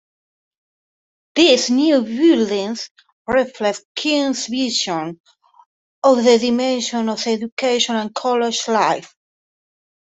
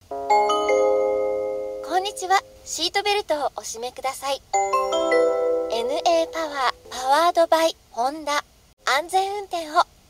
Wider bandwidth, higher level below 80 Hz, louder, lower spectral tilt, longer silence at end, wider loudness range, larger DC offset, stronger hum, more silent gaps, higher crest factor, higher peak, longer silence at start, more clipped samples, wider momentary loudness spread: second, 8.4 kHz vs 16 kHz; about the same, -60 dBFS vs -58 dBFS; first, -17 LUFS vs -22 LUFS; first, -3 dB/octave vs -1.5 dB/octave; first, 1.1 s vs 0.25 s; about the same, 3 LU vs 3 LU; neither; neither; first, 2.91-2.95 s, 3.12-3.25 s, 3.85-3.95 s, 5.20-5.24 s, 5.66-6.02 s, 7.52-7.57 s vs 8.73-8.77 s; about the same, 18 dB vs 18 dB; about the same, -2 dBFS vs -4 dBFS; first, 1.35 s vs 0.1 s; neither; about the same, 10 LU vs 9 LU